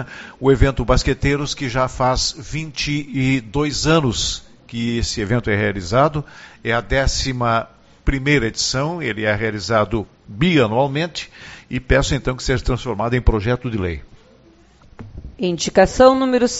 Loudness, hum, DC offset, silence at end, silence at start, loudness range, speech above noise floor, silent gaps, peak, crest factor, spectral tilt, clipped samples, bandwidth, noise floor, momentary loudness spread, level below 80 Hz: -19 LUFS; none; under 0.1%; 0 s; 0 s; 2 LU; 31 dB; none; 0 dBFS; 18 dB; -4.5 dB/octave; under 0.1%; 8 kHz; -50 dBFS; 13 LU; -30 dBFS